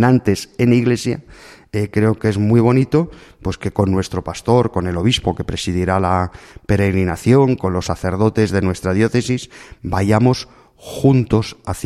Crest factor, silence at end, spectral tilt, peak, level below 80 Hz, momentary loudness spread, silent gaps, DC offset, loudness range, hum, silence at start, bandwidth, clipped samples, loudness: 16 dB; 0 s; -6.5 dB/octave; 0 dBFS; -40 dBFS; 11 LU; none; under 0.1%; 1 LU; none; 0 s; 13.5 kHz; under 0.1%; -17 LUFS